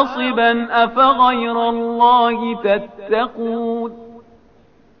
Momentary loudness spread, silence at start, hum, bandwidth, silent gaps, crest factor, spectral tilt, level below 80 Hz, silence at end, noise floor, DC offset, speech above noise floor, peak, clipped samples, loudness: 10 LU; 0 s; 50 Hz at -60 dBFS; 6 kHz; none; 16 dB; -1.5 dB/octave; -52 dBFS; 0.8 s; -52 dBFS; 0.2%; 36 dB; -2 dBFS; under 0.1%; -16 LUFS